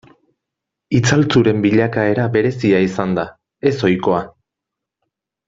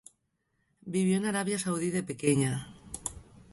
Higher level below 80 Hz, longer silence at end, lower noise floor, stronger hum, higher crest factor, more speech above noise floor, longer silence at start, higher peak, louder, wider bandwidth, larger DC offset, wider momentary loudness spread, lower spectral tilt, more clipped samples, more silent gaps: first, -52 dBFS vs -60 dBFS; first, 1.2 s vs 0.3 s; first, -82 dBFS vs -77 dBFS; neither; about the same, 18 dB vs 20 dB; first, 67 dB vs 48 dB; about the same, 0.9 s vs 0.85 s; first, 0 dBFS vs -12 dBFS; first, -16 LUFS vs -31 LUFS; second, 7.8 kHz vs 12 kHz; neither; second, 7 LU vs 12 LU; first, -6.5 dB/octave vs -5 dB/octave; neither; neither